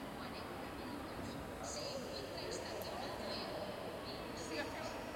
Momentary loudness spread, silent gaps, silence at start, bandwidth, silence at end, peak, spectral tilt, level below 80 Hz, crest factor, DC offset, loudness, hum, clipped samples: 4 LU; none; 0 s; 16.5 kHz; 0 s; -28 dBFS; -4 dB/octave; -62 dBFS; 16 dB; under 0.1%; -45 LUFS; none; under 0.1%